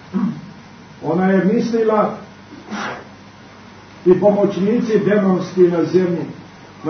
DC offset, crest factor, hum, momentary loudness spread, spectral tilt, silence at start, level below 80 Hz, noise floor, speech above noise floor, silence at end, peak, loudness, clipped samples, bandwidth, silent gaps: under 0.1%; 16 dB; 50 Hz at -45 dBFS; 20 LU; -8 dB/octave; 0 s; -58 dBFS; -40 dBFS; 25 dB; 0 s; -2 dBFS; -17 LUFS; under 0.1%; 6.6 kHz; none